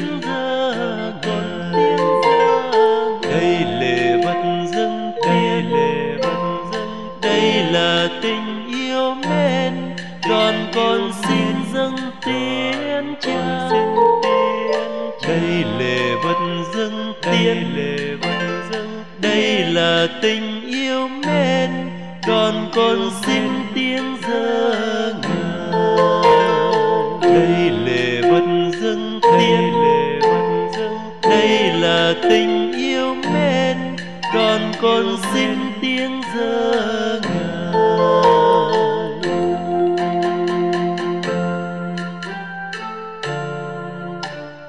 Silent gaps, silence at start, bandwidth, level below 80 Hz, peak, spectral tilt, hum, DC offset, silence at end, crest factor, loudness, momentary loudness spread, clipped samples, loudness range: none; 0 s; 12 kHz; -58 dBFS; -4 dBFS; -5.5 dB/octave; none; 1%; 0 s; 14 dB; -18 LUFS; 10 LU; under 0.1%; 4 LU